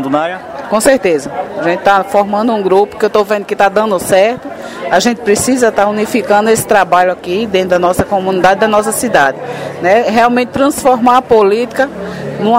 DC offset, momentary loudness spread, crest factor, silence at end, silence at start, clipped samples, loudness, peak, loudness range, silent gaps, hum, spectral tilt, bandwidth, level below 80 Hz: under 0.1%; 7 LU; 12 dB; 0 s; 0 s; 0.4%; -11 LUFS; 0 dBFS; 1 LU; none; none; -4 dB/octave; 16.5 kHz; -44 dBFS